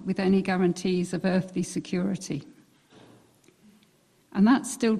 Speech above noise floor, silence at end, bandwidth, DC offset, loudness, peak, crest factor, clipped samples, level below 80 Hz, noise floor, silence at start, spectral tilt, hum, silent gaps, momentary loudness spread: 38 dB; 0 s; 13.5 kHz; under 0.1%; -26 LUFS; -12 dBFS; 16 dB; under 0.1%; -62 dBFS; -63 dBFS; 0 s; -6 dB/octave; none; none; 11 LU